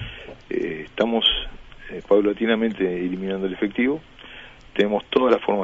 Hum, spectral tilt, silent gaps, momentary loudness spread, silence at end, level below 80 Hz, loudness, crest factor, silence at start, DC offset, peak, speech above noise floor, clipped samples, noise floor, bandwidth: none; -6.5 dB/octave; none; 20 LU; 0 s; -44 dBFS; -22 LUFS; 18 dB; 0 s; under 0.1%; -4 dBFS; 22 dB; under 0.1%; -43 dBFS; 7.6 kHz